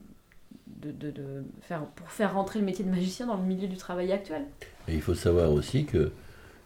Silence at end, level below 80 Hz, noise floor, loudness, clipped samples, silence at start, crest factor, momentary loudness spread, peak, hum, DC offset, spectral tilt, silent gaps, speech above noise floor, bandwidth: 0.05 s; -46 dBFS; -53 dBFS; -30 LUFS; under 0.1%; 0 s; 18 dB; 16 LU; -12 dBFS; none; under 0.1%; -7 dB/octave; none; 23 dB; 16.5 kHz